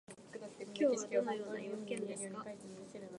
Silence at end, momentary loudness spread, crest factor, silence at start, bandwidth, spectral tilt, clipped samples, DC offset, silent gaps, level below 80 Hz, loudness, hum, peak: 0 s; 16 LU; 20 dB; 0.1 s; 11.5 kHz; -4.5 dB/octave; under 0.1%; under 0.1%; none; -84 dBFS; -39 LUFS; none; -22 dBFS